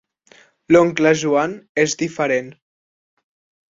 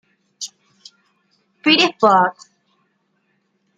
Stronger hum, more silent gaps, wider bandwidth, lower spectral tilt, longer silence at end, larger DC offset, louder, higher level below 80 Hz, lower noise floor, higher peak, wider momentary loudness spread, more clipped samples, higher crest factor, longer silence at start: neither; first, 1.69-1.75 s vs none; second, 7.8 kHz vs 9.4 kHz; first, -4.5 dB/octave vs -3 dB/octave; second, 1.2 s vs 1.45 s; neither; second, -18 LUFS vs -15 LUFS; first, -58 dBFS vs -72 dBFS; second, -52 dBFS vs -67 dBFS; about the same, -2 dBFS vs -2 dBFS; second, 8 LU vs 19 LU; neither; about the same, 18 dB vs 20 dB; first, 0.7 s vs 0.4 s